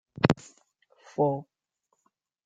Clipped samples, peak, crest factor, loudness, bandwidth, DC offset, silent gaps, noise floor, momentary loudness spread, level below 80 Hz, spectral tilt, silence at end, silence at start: under 0.1%; -2 dBFS; 28 dB; -28 LUFS; 9.2 kHz; under 0.1%; none; -77 dBFS; 11 LU; -60 dBFS; -7 dB/octave; 1.05 s; 0.2 s